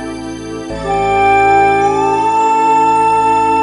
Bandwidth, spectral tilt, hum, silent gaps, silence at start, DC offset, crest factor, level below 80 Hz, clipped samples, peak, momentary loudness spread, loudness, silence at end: 11.5 kHz; -5 dB/octave; none; none; 0 s; under 0.1%; 10 dB; -38 dBFS; under 0.1%; 0 dBFS; 14 LU; -11 LUFS; 0 s